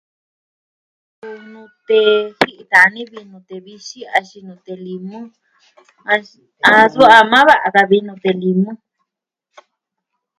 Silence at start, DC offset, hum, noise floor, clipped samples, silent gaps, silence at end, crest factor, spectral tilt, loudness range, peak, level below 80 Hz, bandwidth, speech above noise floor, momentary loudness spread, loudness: 1.25 s; under 0.1%; none; -81 dBFS; 0.4%; none; 1.65 s; 16 dB; -5 dB/octave; 11 LU; 0 dBFS; -58 dBFS; 16 kHz; 67 dB; 26 LU; -12 LUFS